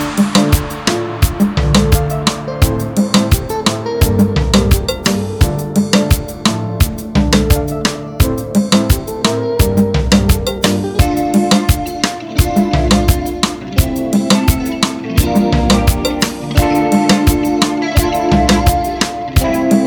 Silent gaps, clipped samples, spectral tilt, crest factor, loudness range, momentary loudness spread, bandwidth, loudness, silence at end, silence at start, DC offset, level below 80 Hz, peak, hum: none; under 0.1%; -5 dB/octave; 12 dB; 1 LU; 5 LU; over 20 kHz; -14 LUFS; 0 s; 0 s; 0.1%; -20 dBFS; 0 dBFS; none